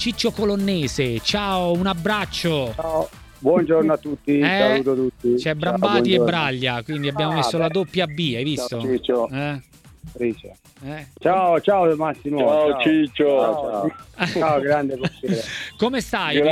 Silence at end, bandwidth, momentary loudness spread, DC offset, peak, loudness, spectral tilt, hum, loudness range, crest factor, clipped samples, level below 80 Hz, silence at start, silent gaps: 0 s; 16 kHz; 9 LU; under 0.1%; -2 dBFS; -21 LUFS; -5.5 dB/octave; none; 4 LU; 18 dB; under 0.1%; -48 dBFS; 0 s; none